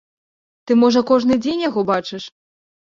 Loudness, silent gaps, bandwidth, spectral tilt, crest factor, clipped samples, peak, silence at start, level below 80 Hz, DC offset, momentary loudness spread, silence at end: -17 LUFS; none; 7.4 kHz; -5.5 dB/octave; 16 dB; under 0.1%; -2 dBFS; 0.65 s; -58 dBFS; under 0.1%; 17 LU; 0.7 s